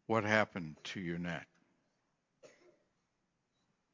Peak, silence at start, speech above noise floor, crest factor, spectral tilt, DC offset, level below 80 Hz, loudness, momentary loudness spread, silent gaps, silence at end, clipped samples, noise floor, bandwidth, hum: -14 dBFS; 0.1 s; 47 dB; 28 dB; -5.5 dB/octave; under 0.1%; -70 dBFS; -36 LUFS; 13 LU; none; 1.45 s; under 0.1%; -83 dBFS; 7.6 kHz; none